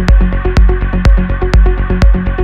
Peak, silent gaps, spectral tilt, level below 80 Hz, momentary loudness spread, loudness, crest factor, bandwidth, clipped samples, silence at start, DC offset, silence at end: 0 dBFS; none; -7.5 dB/octave; -10 dBFS; 2 LU; -12 LUFS; 8 dB; 7 kHz; 0.4%; 0 s; 0.3%; 0 s